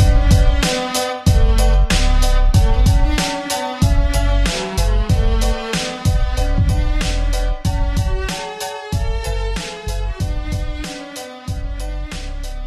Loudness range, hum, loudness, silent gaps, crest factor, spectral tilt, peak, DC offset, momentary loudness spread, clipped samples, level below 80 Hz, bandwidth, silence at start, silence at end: 8 LU; none; -19 LUFS; none; 14 dB; -5 dB/octave; -2 dBFS; 0.1%; 12 LU; under 0.1%; -18 dBFS; 13.5 kHz; 0 s; 0 s